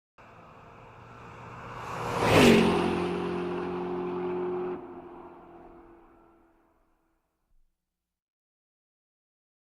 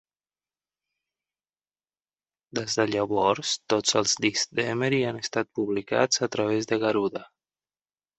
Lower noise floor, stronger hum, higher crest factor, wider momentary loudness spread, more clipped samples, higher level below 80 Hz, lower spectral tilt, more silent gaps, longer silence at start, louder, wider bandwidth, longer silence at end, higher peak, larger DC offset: second, -86 dBFS vs under -90 dBFS; second, none vs 50 Hz at -65 dBFS; about the same, 24 dB vs 22 dB; first, 27 LU vs 6 LU; neither; first, -54 dBFS vs -66 dBFS; first, -5.5 dB/octave vs -3.5 dB/octave; neither; second, 0.4 s vs 2.55 s; about the same, -26 LUFS vs -25 LUFS; first, 16 kHz vs 8.4 kHz; first, 3.8 s vs 0.95 s; about the same, -6 dBFS vs -6 dBFS; neither